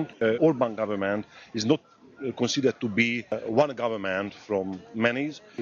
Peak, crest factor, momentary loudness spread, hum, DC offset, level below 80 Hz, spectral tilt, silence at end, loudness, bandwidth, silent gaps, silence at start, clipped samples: -6 dBFS; 20 dB; 10 LU; none; under 0.1%; -70 dBFS; -5 dB/octave; 0 s; -27 LUFS; 7.4 kHz; none; 0 s; under 0.1%